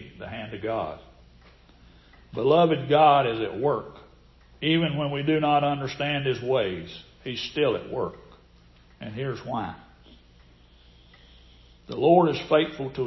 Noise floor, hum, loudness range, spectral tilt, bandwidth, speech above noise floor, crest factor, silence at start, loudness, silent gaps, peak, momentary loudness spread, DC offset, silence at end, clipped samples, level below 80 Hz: -55 dBFS; none; 13 LU; -7 dB/octave; 6 kHz; 30 dB; 20 dB; 0 s; -24 LUFS; none; -6 dBFS; 19 LU; under 0.1%; 0 s; under 0.1%; -54 dBFS